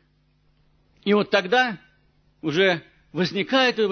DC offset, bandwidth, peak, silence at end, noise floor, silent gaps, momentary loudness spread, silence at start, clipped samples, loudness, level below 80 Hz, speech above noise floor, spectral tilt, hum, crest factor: under 0.1%; 6.6 kHz; -6 dBFS; 0 s; -63 dBFS; none; 12 LU; 1.05 s; under 0.1%; -22 LUFS; -64 dBFS; 42 dB; -5 dB/octave; none; 18 dB